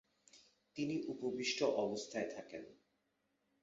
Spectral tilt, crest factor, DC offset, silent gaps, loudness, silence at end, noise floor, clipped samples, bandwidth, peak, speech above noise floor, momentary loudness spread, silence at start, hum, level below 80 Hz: -3.5 dB/octave; 20 dB; under 0.1%; none; -40 LUFS; 0.9 s; -83 dBFS; under 0.1%; 7.6 kHz; -22 dBFS; 43 dB; 17 LU; 0.35 s; 50 Hz at -70 dBFS; -82 dBFS